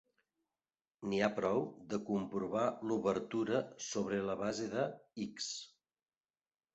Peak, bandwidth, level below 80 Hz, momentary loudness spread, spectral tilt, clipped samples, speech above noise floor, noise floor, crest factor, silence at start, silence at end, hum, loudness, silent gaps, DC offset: -20 dBFS; 8 kHz; -72 dBFS; 8 LU; -4.5 dB/octave; under 0.1%; over 53 dB; under -90 dBFS; 20 dB; 1 s; 1.05 s; none; -38 LUFS; none; under 0.1%